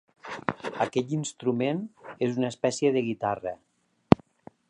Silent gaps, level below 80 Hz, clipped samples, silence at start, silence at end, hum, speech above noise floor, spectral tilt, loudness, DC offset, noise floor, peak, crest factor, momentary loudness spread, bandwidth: none; -54 dBFS; under 0.1%; 0.25 s; 0.55 s; none; 26 dB; -6 dB/octave; -28 LUFS; under 0.1%; -53 dBFS; 0 dBFS; 28 dB; 11 LU; 11 kHz